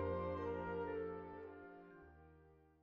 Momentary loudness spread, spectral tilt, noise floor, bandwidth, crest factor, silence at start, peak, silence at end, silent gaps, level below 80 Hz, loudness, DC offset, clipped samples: 21 LU; -7 dB/octave; -67 dBFS; 6.6 kHz; 16 dB; 0 s; -32 dBFS; 0.15 s; none; -66 dBFS; -46 LUFS; under 0.1%; under 0.1%